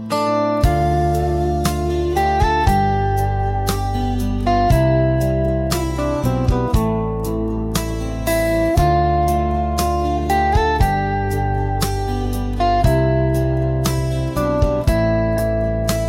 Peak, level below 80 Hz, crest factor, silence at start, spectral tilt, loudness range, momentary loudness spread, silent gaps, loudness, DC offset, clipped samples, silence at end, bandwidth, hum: -4 dBFS; -24 dBFS; 12 dB; 0 s; -6.5 dB/octave; 1 LU; 5 LU; none; -18 LUFS; under 0.1%; under 0.1%; 0 s; 16.5 kHz; none